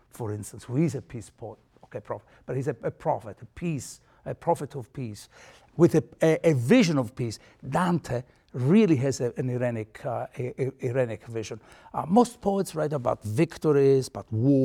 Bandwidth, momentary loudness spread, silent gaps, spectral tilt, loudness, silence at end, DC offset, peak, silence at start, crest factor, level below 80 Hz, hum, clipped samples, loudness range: 16 kHz; 19 LU; none; -7 dB/octave; -26 LUFS; 0 s; under 0.1%; -8 dBFS; 0.15 s; 20 dB; -58 dBFS; none; under 0.1%; 8 LU